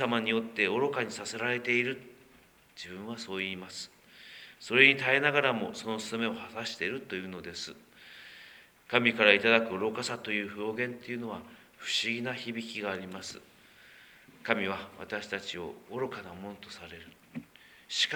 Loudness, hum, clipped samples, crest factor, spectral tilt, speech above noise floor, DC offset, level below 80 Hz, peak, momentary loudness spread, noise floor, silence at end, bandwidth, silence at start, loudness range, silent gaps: -30 LUFS; none; under 0.1%; 28 dB; -3.5 dB/octave; 29 dB; under 0.1%; -72 dBFS; -4 dBFS; 23 LU; -61 dBFS; 0 s; over 20 kHz; 0 s; 9 LU; none